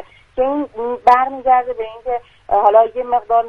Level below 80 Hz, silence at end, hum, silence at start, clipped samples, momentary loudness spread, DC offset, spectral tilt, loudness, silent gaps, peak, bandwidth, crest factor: -48 dBFS; 0 s; none; 0 s; under 0.1%; 13 LU; under 0.1%; -5.5 dB/octave; -16 LUFS; none; 0 dBFS; 6.6 kHz; 16 dB